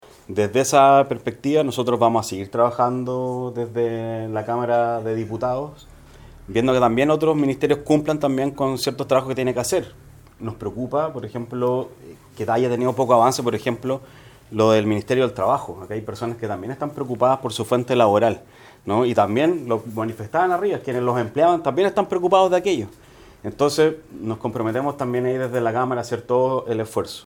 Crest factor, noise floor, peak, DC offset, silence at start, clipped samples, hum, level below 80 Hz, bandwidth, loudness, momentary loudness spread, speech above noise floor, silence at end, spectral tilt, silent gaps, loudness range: 20 dB; -44 dBFS; -2 dBFS; under 0.1%; 0.3 s; under 0.1%; none; -54 dBFS; 19 kHz; -21 LUFS; 12 LU; 23 dB; 0.05 s; -5.5 dB/octave; none; 4 LU